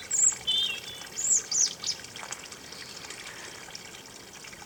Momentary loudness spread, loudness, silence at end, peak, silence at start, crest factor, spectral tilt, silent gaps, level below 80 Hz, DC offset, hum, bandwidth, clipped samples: 20 LU; -26 LUFS; 0 s; -12 dBFS; 0 s; 20 dB; 1.5 dB/octave; none; -66 dBFS; under 0.1%; none; over 20 kHz; under 0.1%